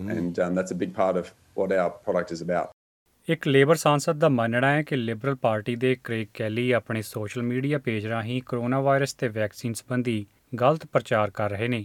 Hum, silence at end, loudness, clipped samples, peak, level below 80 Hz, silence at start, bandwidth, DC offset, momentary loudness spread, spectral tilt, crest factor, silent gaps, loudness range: none; 0 s; -25 LUFS; under 0.1%; -4 dBFS; -66 dBFS; 0 s; 18 kHz; under 0.1%; 8 LU; -6 dB/octave; 20 dB; 2.73-3.06 s; 4 LU